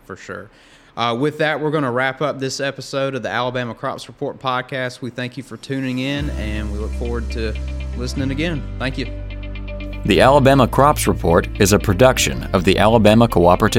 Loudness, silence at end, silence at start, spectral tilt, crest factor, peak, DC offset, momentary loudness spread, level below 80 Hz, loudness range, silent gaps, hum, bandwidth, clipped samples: -18 LUFS; 0 s; 0.1 s; -5 dB/octave; 18 dB; 0 dBFS; under 0.1%; 16 LU; -30 dBFS; 10 LU; none; none; 16.5 kHz; under 0.1%